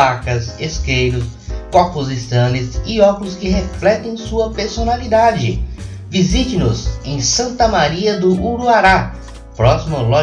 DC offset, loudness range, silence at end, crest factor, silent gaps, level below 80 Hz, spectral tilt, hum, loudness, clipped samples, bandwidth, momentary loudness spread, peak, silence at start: under 0.1%; 3 LU; 0 s; 14 dB; none; -26 dBFS; -5 dB/octave; none; -16 LUFS; under 0.1%; 10 kHz; 9 LU; 0 dBFS; 0 s